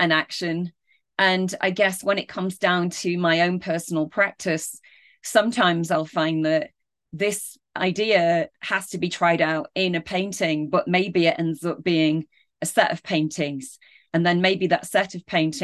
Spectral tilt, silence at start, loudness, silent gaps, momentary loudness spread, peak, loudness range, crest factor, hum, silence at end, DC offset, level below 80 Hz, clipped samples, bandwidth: -4.5 dB/octave; 0 s; -23 LUFS; none; 9 LU; -4 dBFS; 1 LU; 18 dB; none; 0 s; under 0.1%; -66 dBFS; under 0.1%; 12.5 kHz